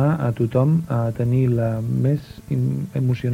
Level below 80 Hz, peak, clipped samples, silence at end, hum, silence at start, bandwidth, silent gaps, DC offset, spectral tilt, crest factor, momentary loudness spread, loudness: -48 dBFS; -6 dBFS; under 0.1%; 0 s; none; 0 s; 9.6 kHz; none; under 0.1%; -9.5 dB/octave; 14 dB; 5 LU; -21 LUFS